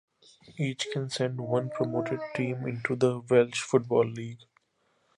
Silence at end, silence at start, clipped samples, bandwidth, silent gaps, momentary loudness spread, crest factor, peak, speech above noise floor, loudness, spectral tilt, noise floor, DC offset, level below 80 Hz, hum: 0.8 s; 0.5 s; under 0.1%; 11.5 kHz; none; 9 LU; 20 dB; -8 dBFS; 44 dB; -29 LUFS; -5.5 dB/octave; -72 dBFS; under 0.1%; -70 dBFS; none